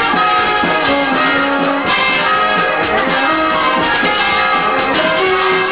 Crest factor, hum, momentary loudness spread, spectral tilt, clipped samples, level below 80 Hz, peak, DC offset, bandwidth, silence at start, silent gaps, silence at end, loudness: 10 dB; none; 2 LU; -7.5 dB/octave; under 0.1%; -42 dBFS; -4 dBFS; 0.4%; 4 kHz; 0 s; none; 0 s; -12 LUFS